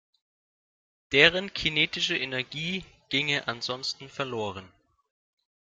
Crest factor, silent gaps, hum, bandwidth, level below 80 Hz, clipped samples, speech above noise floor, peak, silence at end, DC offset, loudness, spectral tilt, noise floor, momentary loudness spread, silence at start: 28 dB; none; none; 13.5 kHz; -60 dBFS; under 0.1%; over 62 dB; -2 dBFS; 1.1 s; under 0.1%; -26 LUFS; -3.5 dB/octave; under -90 dBFS; 14 LU; 1.1 s